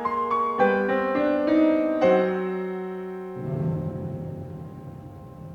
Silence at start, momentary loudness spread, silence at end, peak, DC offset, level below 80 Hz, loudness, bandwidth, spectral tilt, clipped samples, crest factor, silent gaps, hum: 0 s; 19 LU; 0 s; -8 dBFS; under 0.1%; -58 dBFS; -24 LUFS; 6.6 kHz; -8.5 dB/octave; under 0.1%; 16 dB; none; none